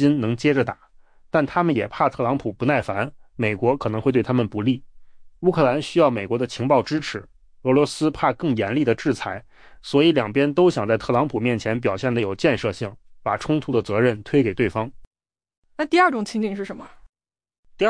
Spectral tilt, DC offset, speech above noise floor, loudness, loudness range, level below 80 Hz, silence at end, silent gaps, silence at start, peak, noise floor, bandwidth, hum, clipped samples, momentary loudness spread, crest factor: -6.5 dB/octave; under 0.1%; 22 dB; -22 LUFS; 2 LU; -52 dBFS; 0 s; 15.07-15.11 s, 15.57-15.62 s, 17.09-17.13 s, 17.58-17.63 s; 0 s; -6 dBFS; -43 dBFS; 10.5 kHz; none; under 0.1%; 11 LU; 16 dB